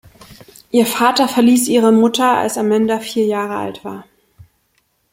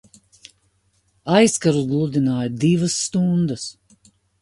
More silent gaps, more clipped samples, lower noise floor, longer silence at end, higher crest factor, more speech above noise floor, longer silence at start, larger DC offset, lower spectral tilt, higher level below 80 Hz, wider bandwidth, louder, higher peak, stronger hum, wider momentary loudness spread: neither; neither; about the same, -63 dBFS vs -64 dBFS; first, 1.1 s vs 0.7 s; about the same, 14 dB vs 18 dB; first, 49 dB vs 45 dB; second, 0.3 s vs 1.25 s; neither; second, -4 dB/octave vs -5.5 dB/octave; about the same, -58 dBFS vs -56 dBFS; first, 16.5 kHz vs 11.5 kHz; first, -15 LUFS vs -19 LUFS; about the same, -2 dBFS vs -4 dBFS; neither; first, 13 LU vs 10 LU